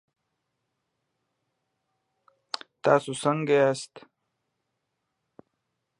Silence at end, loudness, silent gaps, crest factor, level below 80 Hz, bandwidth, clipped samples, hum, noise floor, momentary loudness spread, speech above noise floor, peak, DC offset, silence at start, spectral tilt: 2 s; -25 LUFS; none; 26 dB; -80 dBFS; 11.5 kHz; under 0.1%; none; -80 dBFS; 15 LU; 56 dB; -4 dBFS; under 0.1%; 2.85 s; -5 dB/octave